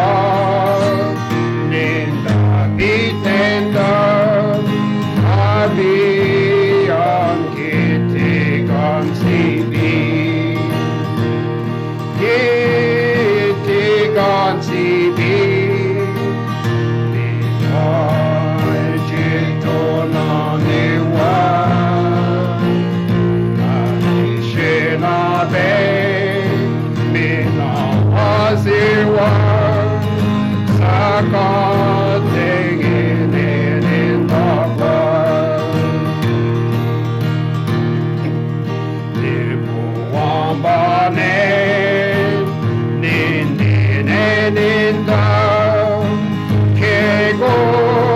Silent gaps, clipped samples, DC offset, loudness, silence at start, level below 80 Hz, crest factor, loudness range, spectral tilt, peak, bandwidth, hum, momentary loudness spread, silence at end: none; under 0.1%; under 0.1%; -15 LUFS; 0 s; -44 dBFS; 12 dB; 3 LU; -7.5 dB/octave; -2 dBFS; 13.5 kHz; none; 5 LU; 0 s